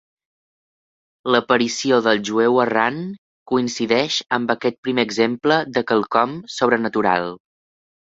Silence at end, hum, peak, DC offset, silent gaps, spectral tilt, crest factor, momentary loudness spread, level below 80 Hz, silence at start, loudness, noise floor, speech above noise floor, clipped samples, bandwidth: 0.75 s; none; -2 dBFS; under 0.1%; 3.18-3.46 s, 4.78-4.83 s; -4 dB/octave; 20 dB; 6 LU; -62 dBFS; 1.25 s; -19 LUFS; under -90 dBFS; over 71 dB; under 0.1%; 8 kHz